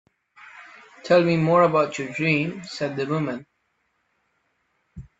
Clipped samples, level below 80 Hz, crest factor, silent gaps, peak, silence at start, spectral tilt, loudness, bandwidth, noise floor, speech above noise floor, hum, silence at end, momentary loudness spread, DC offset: under 0.1%; -60 dBFS; 18 dB; none; -6 dBFS; 0.4 s; -6.5 dB/octave; -22 LUFS; 8 kHz; -72 dBFS; 50 dB; none; 0.2 s; 23 LU; under 0.1%